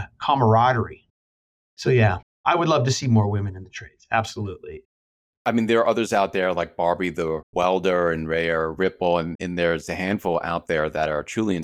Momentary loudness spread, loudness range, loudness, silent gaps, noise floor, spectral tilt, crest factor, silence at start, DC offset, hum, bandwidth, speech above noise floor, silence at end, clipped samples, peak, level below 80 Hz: 10 LU; 3 LU; -22 LUFS; 1.10-1.77 s, 2.23-2.44 s, 4.85-5.45 s, 7.43-7.53 s, 9.35-9.39 s; under -90 dBFS; -6 dB/octave; 18 dB; 0 s; under 0.1%; none; 13 kHz; over 68 dB; 0 s; under 0.1%; -4 dBFS; -50 dBFS